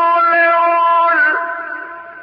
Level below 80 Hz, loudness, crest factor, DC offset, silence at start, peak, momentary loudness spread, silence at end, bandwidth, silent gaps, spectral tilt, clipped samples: -74 dBFS; -12 LUFS; 10 dB; under 0.1%; 0 s; -4 dBFS; 15 LU; 0 s; 5.4 kHz; none; -5 dB/octave; under 0.1%